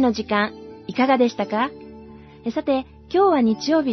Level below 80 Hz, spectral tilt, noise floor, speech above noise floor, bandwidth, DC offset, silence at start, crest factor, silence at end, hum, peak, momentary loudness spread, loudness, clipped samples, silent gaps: -54 dBFS; -5.5 dB/octave; -42 dBFS; 22 dB; 6.2 kHz; under 0.1%; 0 s; 16 dB; 0 s; none; -6 dBFS; 14 LU; -21 LUFS; under 0.1%; none